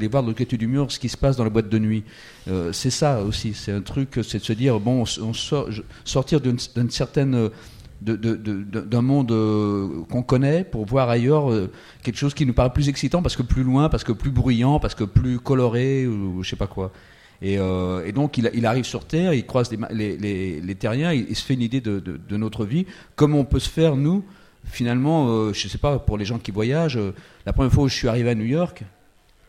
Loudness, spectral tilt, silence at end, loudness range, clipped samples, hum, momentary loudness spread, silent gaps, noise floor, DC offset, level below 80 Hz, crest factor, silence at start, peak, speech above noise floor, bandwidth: -22 LUFS; -6.5 dB/octave; 0.6 s; 3 LU; under 0.1%; none; 9 LU; none; -55 dBFS; under 0.1%; -36 dBFS; 20 dB; 0 s; -2 dBFS; 34 dB; 13 kHz